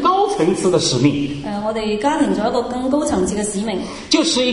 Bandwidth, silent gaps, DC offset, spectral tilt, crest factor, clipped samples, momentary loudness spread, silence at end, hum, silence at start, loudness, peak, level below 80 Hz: 11 kHz; none; under 0.1%; -4.5 dB/octave; 16 dB; under 0.1%; 7 LU; 0 s; none; 0 s; -18 LUFS; -2 dBFS; -44 dBFS